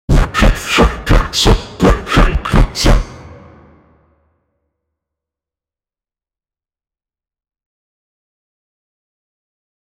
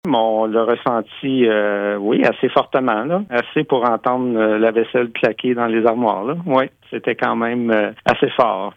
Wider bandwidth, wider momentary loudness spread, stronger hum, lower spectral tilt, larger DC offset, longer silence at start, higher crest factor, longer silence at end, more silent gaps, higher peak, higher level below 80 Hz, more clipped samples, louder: first, 15.5 kHz vs 7.8 kHz; about the same, 3 LU vs 4 LU; neither; second, -5 dB/octave vs -7.5 dB/octave; neither; about the same, 0.1 s vs 0.05 s; about the same, 14 dB vs 16 dB; first, 6.65 s vs 0.05 s; neither; about the same, -2 dBFS vs -2 dBFS; first, -18 dBFS vs -60 dBFS; neither; first, -13 LUFS vs -18 LUFS